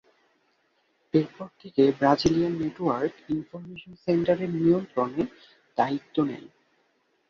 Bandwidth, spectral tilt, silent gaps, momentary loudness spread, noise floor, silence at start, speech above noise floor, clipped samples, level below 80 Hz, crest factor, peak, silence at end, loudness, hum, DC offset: 7.2 kHz; -7 dB/octave; none; 14 LU; -70 dBFS; 1.15 s; 44 dB; under 0.1%; -58 dBFS; 20 dB; -6 dBFS; 0.85 s; -26 LUFS; none; under 0.1%